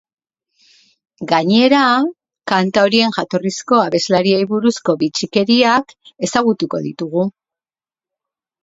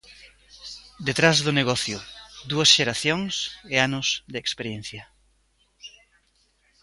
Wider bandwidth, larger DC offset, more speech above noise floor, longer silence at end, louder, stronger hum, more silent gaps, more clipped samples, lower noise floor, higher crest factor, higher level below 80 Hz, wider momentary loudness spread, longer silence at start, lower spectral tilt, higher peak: second, 8 kHz vs 11.5 kHz; neither; first, over 75 dB vs 42 dB; first, 1.35 s vs 0.95 s; first, -15 LUFS vs -22 LUFS; neither; neither; neither; first, under -90 dBFS vs -66 dBFS; second, 16 dB vs 26 dB; about the same, -60 dBFS vs -56 dBFS; second, 10 LU vs 23 LU; first, 1.2 s vs 0.1 s; first, -4.5 dB/octave vs -3 dB/octave; about the same, 0 dBFS vs 0 dBFS